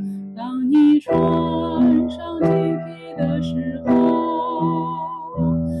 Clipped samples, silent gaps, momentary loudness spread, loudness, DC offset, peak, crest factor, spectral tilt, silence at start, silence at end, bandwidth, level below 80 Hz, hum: under 0.1%; none; 12 LU; -20 LUFS; under 0.1%; -8 dBFS; 10 dB; -9.5 dB/octave; 0 s; 0 s; 6 kHz; -48 dBFS; none